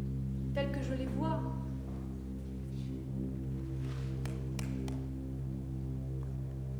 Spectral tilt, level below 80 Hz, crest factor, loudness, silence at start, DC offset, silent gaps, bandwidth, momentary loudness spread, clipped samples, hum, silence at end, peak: -8 dB/octave; -44 dBFS; 18 dB; -39 LUFS; 0 s; under 0.1%; none; 12 kHz; 6 LU; under 0.1%; none; 0 s; -20 dBFS